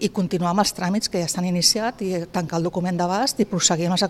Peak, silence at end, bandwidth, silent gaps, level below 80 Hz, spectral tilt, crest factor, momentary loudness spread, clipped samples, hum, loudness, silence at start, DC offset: -2 dBFS; 0 s; 15.5 kHz; none; -54 dBFS; -4 dB/octave; 20 dB; 7 LU; under 0.1%; none; -21 LUFS; 0 s; under 0.1%